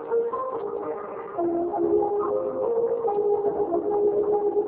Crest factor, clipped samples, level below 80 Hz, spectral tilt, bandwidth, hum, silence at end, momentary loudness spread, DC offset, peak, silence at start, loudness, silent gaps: 14 dB; under 0.1%; -60 dBFS; -11.5 dB/octave; 3 kHz; none; 0 s; 8 LU; under 0.1%; -12 dBFS; 0 s; -25 LUFS; none